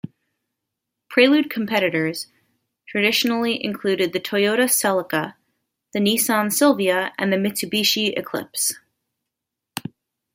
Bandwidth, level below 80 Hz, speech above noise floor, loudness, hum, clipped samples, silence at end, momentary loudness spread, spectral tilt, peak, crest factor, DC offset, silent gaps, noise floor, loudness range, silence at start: 16.5 kHz; -68 dBFS; 63 dB; -20 LUFS; none; under 0.1%; 0.55 s; 16 LU; -3 dB/octave; -2 dBFS; 20 dB; under 0.1%; none; -83 dBFS; 2 LU; 0.05 s